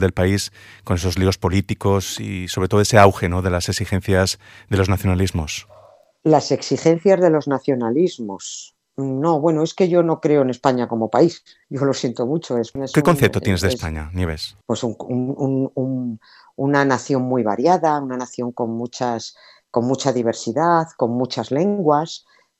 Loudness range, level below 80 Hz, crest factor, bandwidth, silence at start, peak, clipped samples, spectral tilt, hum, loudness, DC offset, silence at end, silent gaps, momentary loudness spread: 3 LU; -48 dBFS; 18 dB; 15.5 kHz; 0 s; 0 dBFS; under 0.1%; -6 dB/octave; none; -19 LUFS; under 0.1%; 0.4 s; none; 11 LU